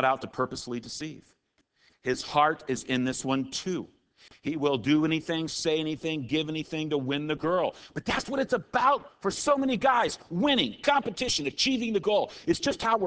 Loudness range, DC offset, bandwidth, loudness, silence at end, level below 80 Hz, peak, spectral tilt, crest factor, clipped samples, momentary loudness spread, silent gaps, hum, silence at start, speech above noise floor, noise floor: 4 LU; under 0.1%; 8 kHz; -28 LUFS; 0 s; -58 dBFS; -8 dBFS; -4 dB/octave; 20 dB; under 0.1%; 10 LU; none; none; 0 s; 41 dB; -68 dBFS